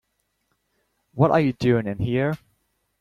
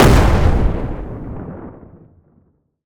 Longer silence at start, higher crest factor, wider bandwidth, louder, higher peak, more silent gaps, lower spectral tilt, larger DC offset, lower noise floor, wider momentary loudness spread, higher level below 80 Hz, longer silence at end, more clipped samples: first, 1.15 s vs 0 s; about the same, 20 dB vs 16 dB; second, 13 kHz vs over 20 kHz; second, -22 LUFS vs -17 LUFS; second, -4 dBFS vs 0 dBFS; neither; first, -8.5 dB/octave vs -6.5 dB/octave; neither; first, -73 dBFS vs -58 dBFS; second, 12 LU vs 21 LU; second, -52 dBFS vs -20 dBFS; second, 0.65 s vs 1.1 s; neither